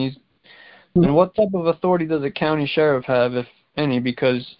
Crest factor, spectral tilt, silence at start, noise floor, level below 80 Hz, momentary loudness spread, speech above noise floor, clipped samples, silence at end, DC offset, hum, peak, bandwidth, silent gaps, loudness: 18 dB; -11.5 dB/octave; 0 s; -50 dBFS; -50 dBFS; 7 LU; 31 dB; under 0.1%; 0.1 s; under 0.1%; none; -2 dBFS; 5.6 kHz; none; -20 LUFS